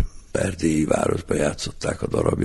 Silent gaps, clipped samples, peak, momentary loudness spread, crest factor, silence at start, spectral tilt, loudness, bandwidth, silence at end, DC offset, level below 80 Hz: none; under 0.1%; -4 dBFS; 7 LU; 18 dB; 0 s; -5.5 dB/octave; -23 LUFS; 11.5 kHz; 0 s; under 0.1%; -38 dBFS